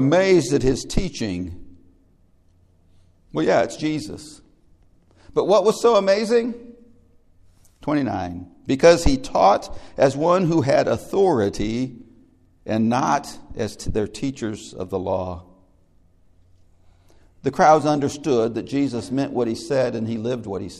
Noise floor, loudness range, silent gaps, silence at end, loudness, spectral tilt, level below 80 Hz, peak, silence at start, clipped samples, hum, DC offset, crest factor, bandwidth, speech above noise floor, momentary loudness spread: -57 dBFS; 8 LU; none; 0 s; -21 LUFS; -5.5 dB/octave; -40 dBFS; 0 dBFS; 0 s; under 0.1%; none; under 0.1%; 20 dB; 13.5 kHz; 37 dB; 14 LU